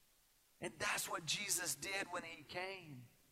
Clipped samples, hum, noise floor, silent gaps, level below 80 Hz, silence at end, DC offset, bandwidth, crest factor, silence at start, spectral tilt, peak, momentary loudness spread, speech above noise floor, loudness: under 0.1%; none; -73 dBFS; none; -76 dBFS; 0.25 s; under 0.1%; 16 kHz; 22 dB; 0.6 s; -1 dB/octave; -22 dBFS; 13 LU; 29 dB; -41 LUFS